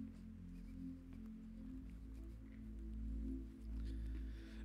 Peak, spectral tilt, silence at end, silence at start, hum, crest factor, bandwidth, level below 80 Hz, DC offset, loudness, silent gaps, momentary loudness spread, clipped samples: -36 dBFS; -8 dB/octave; 0 s; 0 s; none; 12 dB; 6.2 kHz; -50 dBFS; under 0.1%; -52 LUFS; none; 7 LU; under 0.1%